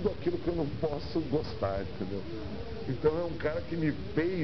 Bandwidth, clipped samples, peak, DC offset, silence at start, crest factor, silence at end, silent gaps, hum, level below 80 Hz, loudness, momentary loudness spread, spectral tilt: 6.2 kHz; under 0.1%; -16 dBFS; 0.9%; 0 s; 18 dB; 0 s; none; none; -48 dBFS; -33 LUFS; 8 LU; -6.5 dB/octave